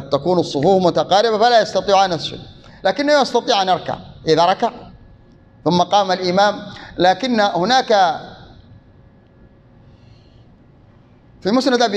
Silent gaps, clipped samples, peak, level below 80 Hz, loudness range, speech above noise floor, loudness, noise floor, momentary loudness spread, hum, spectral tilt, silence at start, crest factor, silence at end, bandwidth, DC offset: none; under 0.1%; -2 dBFS; -52 dBFS; 7 LU; 32 dB; -16 LUFS; -48 dBFS; 12 LU; none; -4.5 dB/octave; 0 s; 16 dB; 0 s; 9.6 kHz; under 0.1%